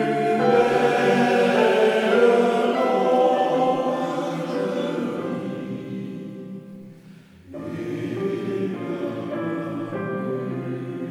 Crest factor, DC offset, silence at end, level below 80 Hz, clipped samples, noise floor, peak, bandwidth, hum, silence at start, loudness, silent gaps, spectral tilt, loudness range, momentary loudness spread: 18 dB; under 0.1%; 0 s; -68 dBFS; under 0.1%; -46 dBFS; -4 dBFS; 13 kHz; none; 0 s; -22 LUFS; none; -6 dB/octave; 13 LU; 15 LU